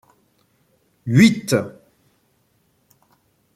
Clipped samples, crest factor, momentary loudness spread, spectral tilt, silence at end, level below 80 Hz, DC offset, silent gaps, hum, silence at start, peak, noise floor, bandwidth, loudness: under 0.1%; 20 dB; 21 LU; -6 dB/octave; 1.85 s; -60 dBFS; under 0.1%; none; none; 1.05 s; -2 dBFS; -64 dBFS; 14.5 kHz; -17 LUFS